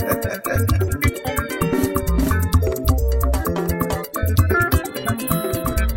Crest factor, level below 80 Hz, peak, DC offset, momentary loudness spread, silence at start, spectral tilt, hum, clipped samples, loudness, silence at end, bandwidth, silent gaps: 16 dB; -24 dBFS; -2 dBFS; 0.2%; 5 LU; 0 s; -6 dB/octave; none; under 0.1%; -20 LUFS; 0 s; 16.5 kHz; none